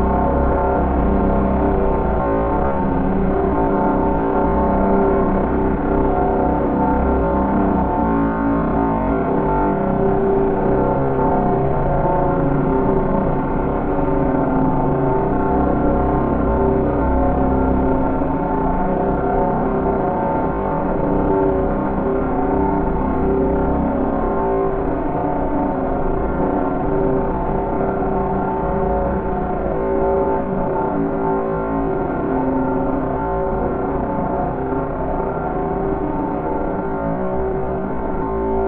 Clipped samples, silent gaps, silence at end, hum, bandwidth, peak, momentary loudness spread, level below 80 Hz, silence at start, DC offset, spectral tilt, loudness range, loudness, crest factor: under 0.1%; none; 0 s; none; 3.9 kHz; -4 dBFS; 4 LU; -26 dBFS; 0 s; under 0.1%; -13 dB/octave; 3 LU; -19 LUFS; 14 dB